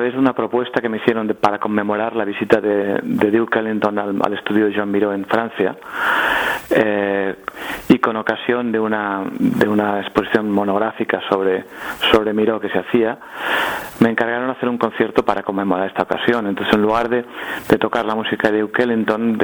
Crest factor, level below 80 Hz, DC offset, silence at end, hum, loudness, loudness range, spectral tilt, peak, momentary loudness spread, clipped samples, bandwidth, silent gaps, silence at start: 18 dB; -50 dBFS; under 0.1%; 0 s; none; -18 LUFS; 1 LU; -6 dB/octave; 0 dBFS; 6 LU; under 0.1%; over 20 kHz; none; 0 s